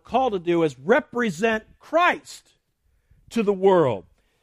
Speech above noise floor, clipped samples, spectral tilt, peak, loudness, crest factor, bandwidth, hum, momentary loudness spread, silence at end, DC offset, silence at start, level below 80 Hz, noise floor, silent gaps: 46 dB; under 0.1%; -5.5 dB/octave; -6 dBFS; -22 LUFS; 18 dB; 14.5 kHz; none; 11 LU; 0.4 s; under 0.1%; 0.1 s; -58 dBFS; -67 dBFS; none